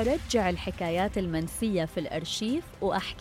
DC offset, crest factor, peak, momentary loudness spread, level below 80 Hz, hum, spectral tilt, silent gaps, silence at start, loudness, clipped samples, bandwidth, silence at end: under 0.1%; 16 dB; -14 dBFS; 5 LU; -44 dBFS; none; -5 dB/octave; none; 0 s; -30 LUFS; under 0.1%; 16.5 kHz; 0 s